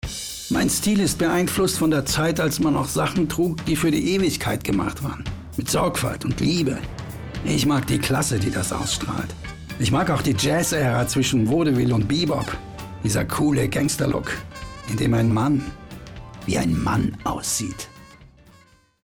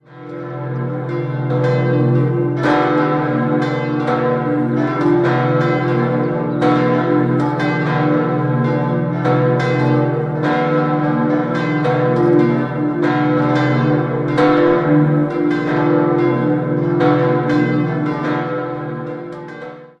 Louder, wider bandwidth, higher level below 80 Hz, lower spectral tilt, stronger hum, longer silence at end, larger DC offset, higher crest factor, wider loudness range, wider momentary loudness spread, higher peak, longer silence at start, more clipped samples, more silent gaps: second, -22 LUFS vs -16 LUFS; first, over 20 kHz vs 7.8 kHz; first, -40 dBFS vs -52 dBFS; second, -5 dB/octave vs -9 dB/octave; neither; first, 0.8 s vs 0.15 s; neither; about the same, 10 dB vs 14 dB; about the same, 3 LU vs 2 LU; first, 13 LU vs 8 LU; second, -12 dBFS vs -2 dBFS; about the same, 0.05 s vs 0.1 s; neither; neither